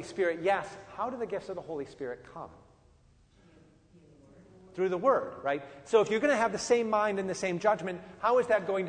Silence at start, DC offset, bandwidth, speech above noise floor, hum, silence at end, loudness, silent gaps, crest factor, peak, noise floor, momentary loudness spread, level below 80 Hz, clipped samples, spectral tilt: 0 s; under 0.1%; 9.6 kHz; 32 dB; none; 0 s; -30 LUFS; none; 20 dB; -12 dBFS; -62 dBFS; 14 LU; -66 dBFS; under 0.1%; -4.5 dB/octave